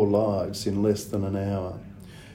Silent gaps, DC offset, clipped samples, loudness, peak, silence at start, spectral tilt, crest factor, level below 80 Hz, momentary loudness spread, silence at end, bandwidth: none; under 0.1%; under 0.1%; -27 LUFS; -10 dBFS; 0 s; -7 dB/octave; 16 dB; -54 dBFS; 18 LU; 0 s; 16 kHz